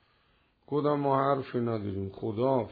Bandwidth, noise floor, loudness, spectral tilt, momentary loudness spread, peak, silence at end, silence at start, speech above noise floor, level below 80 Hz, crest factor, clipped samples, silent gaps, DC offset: 5 kHz; -68 dBFS; -30 LUFS; -11 dB/octave; 9 LU; -14 dBFS; 0 s; 0.7 s; 40 dB; -68 dBFS; 16 dB; under 0.1%; none; under 0.1%